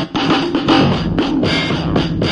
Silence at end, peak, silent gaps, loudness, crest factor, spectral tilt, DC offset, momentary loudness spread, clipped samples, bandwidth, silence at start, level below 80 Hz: 0 s; 0 dBFS; none; -15 LUFS; 14 dB; -6 dB/octave; under 0.1%; 4 LU; under 0.1%; 10.5 kHz; 0 s; -34 dBFS